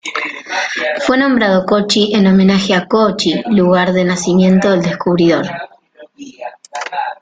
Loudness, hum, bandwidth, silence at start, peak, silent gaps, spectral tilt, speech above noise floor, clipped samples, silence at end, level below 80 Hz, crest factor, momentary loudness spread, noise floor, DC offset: -13 LUFS; none; 9.2 kHz; 0.05 s; 0 dBFS; none; -5.5 dB/octave; 30 dB; under 0.1%; 0.1 s; -50 dBFS; 12 dB; 14 LU; -42 dBFS; under 0.1%